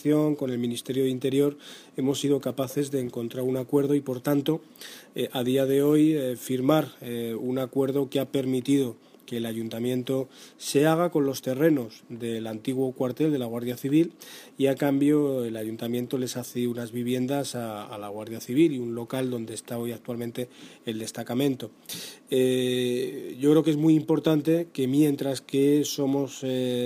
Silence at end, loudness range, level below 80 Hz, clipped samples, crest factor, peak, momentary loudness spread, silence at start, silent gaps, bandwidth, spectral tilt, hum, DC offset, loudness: 0 s; 6 LU; -72 dBFS; under 0.1%; 18 dB; -8 dBFS; 13 LU; 0 s; none; 15.5 kHz; -6 dB/octave; none; under 0.1%; -26 LUFS